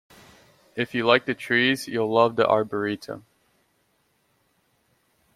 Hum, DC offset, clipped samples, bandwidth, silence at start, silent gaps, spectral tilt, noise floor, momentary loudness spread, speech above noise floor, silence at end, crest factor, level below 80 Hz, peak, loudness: none; under 0.1%; under 0.1%; 15.5 kHz; 0.75 s; none; -5 dB/octave; -68 dBFS; 15 LU; 46 dB; 2.15 s; 24 dB; -68 dBFS; -2 dBFS; -23 LUFS